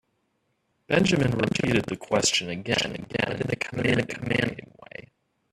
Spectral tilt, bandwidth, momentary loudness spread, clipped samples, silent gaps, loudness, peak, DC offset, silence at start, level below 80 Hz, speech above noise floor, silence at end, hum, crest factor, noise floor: -4 dB/octave; 13.5 kHz; 17 LU; under 0.1%; none; -25 LUFS; -6 dBFS; under 0.1%; 0.9 s; -54 dBFS; 48 dB; 0.5 s; none; 20 dB; -73 dBFS